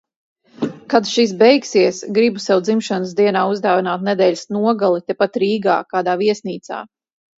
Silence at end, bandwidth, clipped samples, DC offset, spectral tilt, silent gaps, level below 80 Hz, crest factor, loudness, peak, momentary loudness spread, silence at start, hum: 0.55 s; 8 kHz; under 0.1%; under 0.1%; -5 dB/octave; none; -66 dBFS; 16 dB; -17 LUFS; 0 dBFS; 12 LU; 0.6 s; none